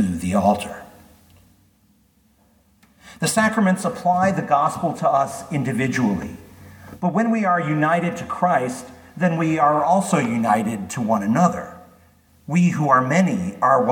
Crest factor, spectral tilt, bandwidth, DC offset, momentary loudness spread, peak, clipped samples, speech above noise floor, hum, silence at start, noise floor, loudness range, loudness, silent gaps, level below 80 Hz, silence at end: 18 dB; -6 dB/octave; 19 kHz; under 0.1%; 9 LU; -2 dBFS; under 0.1%; 40 dB; none; 0 s; -59 dBFS; 4 LU; -20 LUFS; none; -56 dBFS; 0 s